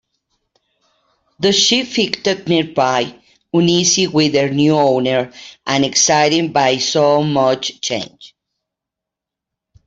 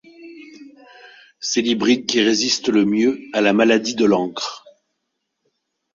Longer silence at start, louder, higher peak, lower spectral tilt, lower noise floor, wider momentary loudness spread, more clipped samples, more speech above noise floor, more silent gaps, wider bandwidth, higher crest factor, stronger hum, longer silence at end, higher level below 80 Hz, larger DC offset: first, 1.4 s vs 0.2 s; first, -15 LUFS vs -18 LUFS; about the same, 0 dBFS vs -2 dBFS; about the same, -3.5 dB/octave vs -3.5 dB/octave; first, -84 dBFS vs -76 dBFS; second, 8 LU vs 11 LU; neither; first, 69 dB vs 58 dB; neither; about the same, 8 kHz vs 7.8 kHz; about the same, 16 dB vs 18 dB; neither; first, 1.6 s vs 1.35 s; about the same, -58 dBFS vs -62 dBFS; neither